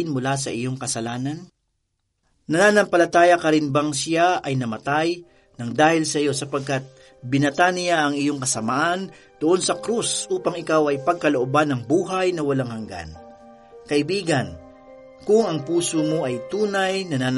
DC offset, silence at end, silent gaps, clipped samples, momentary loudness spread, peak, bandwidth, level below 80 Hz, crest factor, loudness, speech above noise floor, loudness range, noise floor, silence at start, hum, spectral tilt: under 0.1%; 0 s; none; under 0.1%; 11 LU; -2 dBFS; 11.5 kHz; -58 dBFS; 18 dB; -21 LUFS; 52 dB; 5 LU; -73 dBFS; 0 s; none; -4.5 dB/octave